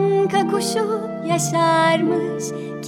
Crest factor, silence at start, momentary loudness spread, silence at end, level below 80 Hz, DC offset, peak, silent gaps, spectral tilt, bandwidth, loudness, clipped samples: 14 dB; 0 s; 9 LU; 0 s; -64 dBFS; under 0.1%; -6 dBFS; none; -4.5 dB/octave; 17.5 kHz; -19 LUFS; under 0.1%